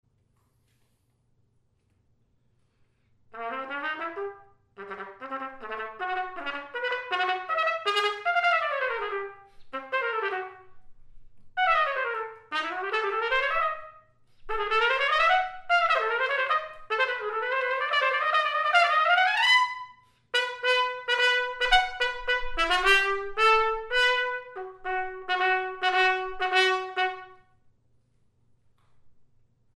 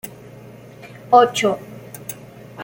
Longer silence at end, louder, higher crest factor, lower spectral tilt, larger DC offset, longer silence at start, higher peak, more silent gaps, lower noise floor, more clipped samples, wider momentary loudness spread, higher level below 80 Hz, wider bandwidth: first, 0.65 s vs 0 s; second, -25 LUFS vs -16 LUFS; about the same, 20 dB vs 20 dB; second, -1 dB/octave vs -4 dB/octave; neither; first, 3.35 s vs 0.05 s; second, -8 dBFS vs -2 dBFS; neither; first, -69 dBFS vs -40 dBFS; neither; second, 15 LU vs 26 LU; first, -50 dBFS vs -60 dBFS; second, 13.5 kHz vs 17 kHz